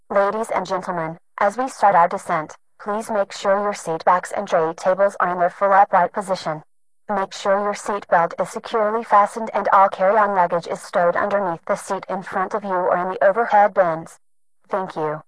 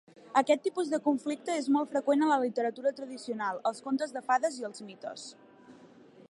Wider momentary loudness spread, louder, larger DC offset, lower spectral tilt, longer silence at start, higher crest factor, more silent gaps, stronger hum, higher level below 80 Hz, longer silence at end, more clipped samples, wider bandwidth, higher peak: second, 11 LU vs 15 LU; first, -20 LUFS vs -30 LUFS; neither; about the same, -5 dB/octave vs -4 dB/octave; second, 0.1 s vs 0.3 s; about the same, 16 dB vs 20 dB; neither; neither; first, -62 dBFS vs -86 dBFS; second, 0.05 s vs 0.55 s; neither; about the same, 11 kHz vs 11.5 kHz; first, -2 dBFS vs -12 dBFS